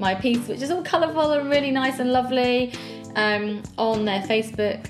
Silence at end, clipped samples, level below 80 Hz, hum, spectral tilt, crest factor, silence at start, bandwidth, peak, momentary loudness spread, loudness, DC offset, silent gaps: 0 s; under 0.1%; -56 dBFS; none; -5 dB/octave; 16 dB; 0 s; 13.5 kHz; -8 dBFS; 6 LU; -23 LUFS; under 0.1%; none